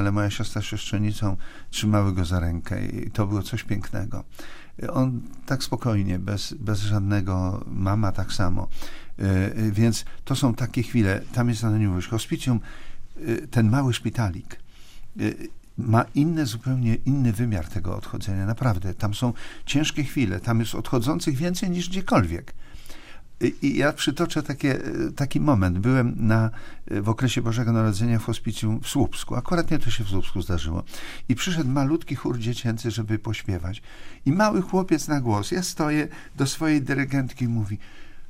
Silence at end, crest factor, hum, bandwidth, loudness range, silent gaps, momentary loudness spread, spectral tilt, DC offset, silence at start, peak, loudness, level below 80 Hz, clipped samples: 0 s; 18 dB; none; 16 kHz; 3 LU; none; 10 LU; -6 dB/octave; under 0.1%; 0 s; -4 dBFS; -25 LUFS; -38 dBFS; under 0.1%